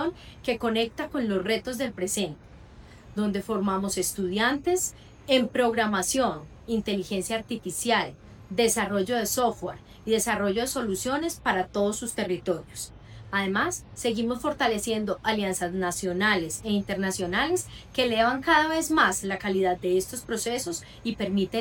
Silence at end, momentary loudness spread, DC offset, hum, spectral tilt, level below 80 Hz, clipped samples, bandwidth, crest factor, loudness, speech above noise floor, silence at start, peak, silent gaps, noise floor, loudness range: 0 s; 9 LU; under 0.1%; none; -3.5 dB/octave; -52 dBFS; under 0.1%; 18.5 kHz; 20 dB; -27 LUFS; 21 dB; 0 s; -8 dBFS; none; -48 dBFS; 4 LU